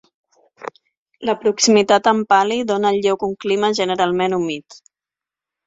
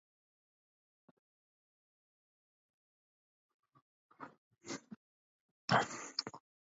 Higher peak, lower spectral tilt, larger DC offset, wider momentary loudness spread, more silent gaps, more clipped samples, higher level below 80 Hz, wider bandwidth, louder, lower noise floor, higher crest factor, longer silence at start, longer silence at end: first, -2 dBFS vs -18 dBFS; about the same, -3.5 dB/octave vs -2.5 dB/octave; neither; second, 16 LU vs 25 LU; second, 0.97-1.06 s vs 4.38-4.51 s, 4.96-5.68 s; neither; first, -62 dBFS vs -80 dBFS; about the same, 7.8 kHz vs 7.6 kHz; first, -17 LUFS vs -38 LUFS; about the same, -89 dBFS vs under -90 dBFS; second, 18 dB vs 28 dB; second, 0.6 s vs 4.2 s; first, 1.05 s vs 0.35 s